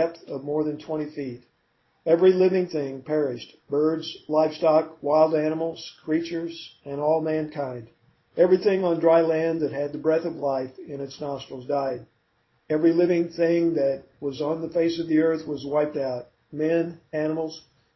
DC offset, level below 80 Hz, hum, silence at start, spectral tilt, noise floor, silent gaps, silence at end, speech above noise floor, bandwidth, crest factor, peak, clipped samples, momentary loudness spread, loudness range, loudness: under 0.1%; -66 dBFS; none; 0 s; -7.5 dB/octave; -68 dBFS; none; 0.35 s; 45 dB; 6 kHz; 18 dB; -6 dBFS; under 0.1%; 15 LU; 3 LU; -24 LUFS